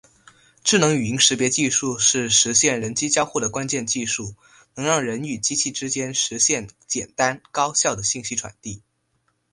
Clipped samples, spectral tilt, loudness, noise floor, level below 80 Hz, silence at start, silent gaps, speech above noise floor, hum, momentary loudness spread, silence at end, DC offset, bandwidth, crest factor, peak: under 0.1%; -2 dB/octave; -20 LUFS; -69 dBFS; -56 dBFS; 0.65 s; none; 47 dB; none; 11 LU; 0.75 s; under 0.1%; 11.5 kHz; 22 dB; -2 dBFS